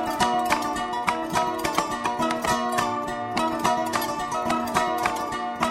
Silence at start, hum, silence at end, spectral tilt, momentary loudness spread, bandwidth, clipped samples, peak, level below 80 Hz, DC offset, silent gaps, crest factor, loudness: 0 s; none; 0 s; -3.5 dB/octave; 4 LU; 16 kHz; under 0.1%; -6 dBFS; -52 dBFS; under 0.1%; none; 20 dB; -25 LUFS